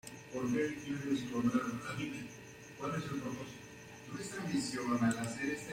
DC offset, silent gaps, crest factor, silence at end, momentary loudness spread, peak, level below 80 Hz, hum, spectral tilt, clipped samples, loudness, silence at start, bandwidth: under 0.1%; none; 18 dB; 0 s; 15 LU; -20 dBFS; -68 dBFS; none; -5 dB/octave; under 0.1%; -38 LUFS; 0.05 s; 16 kHz